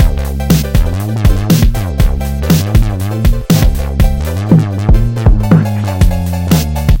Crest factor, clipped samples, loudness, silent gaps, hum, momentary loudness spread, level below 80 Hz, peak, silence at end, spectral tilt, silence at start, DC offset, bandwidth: 10 dB; 0.7%; -12 LUFS; none; none; 4 LU; -14 dBFS; 0 dBFS; 0 s; -6.5 dB/octave; 0 s; 1%; 17.5 kHz